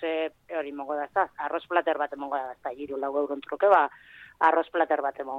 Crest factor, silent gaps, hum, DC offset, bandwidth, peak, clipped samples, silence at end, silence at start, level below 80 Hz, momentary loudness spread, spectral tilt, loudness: 20 dB; none; none; under 0.1%; 5.4 kHz; -8 dBFS; under 0.1%; 0 s; 0 s; -70 dBFS; 11 LU; -5.5 dB/octave; -27 LUFS